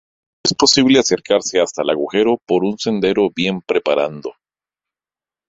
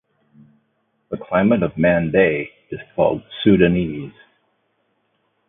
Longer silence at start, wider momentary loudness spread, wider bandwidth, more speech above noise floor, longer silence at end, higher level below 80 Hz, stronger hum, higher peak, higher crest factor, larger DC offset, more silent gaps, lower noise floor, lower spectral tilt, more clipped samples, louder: second, 0.45 s vs 1.1 s; second, 8 LU vs 17 LU; first, 8 kHz vs 3.8 kHz; first, over 74 dB vs 50 dB; second, 1.2 s vs 1.4 s; second, -54 dBFS vs -46 dBFS; neither; about the same, 0 dBFS vs 0 dBFS; about the same, 18 dB vs 20 dB; neither; neither; first, under -90 dBFS vs -68 dBFS; second, -3.5 dB/octave vs -12 dB/octave; neither; about the same, -16 LUFS vs -18 LUFS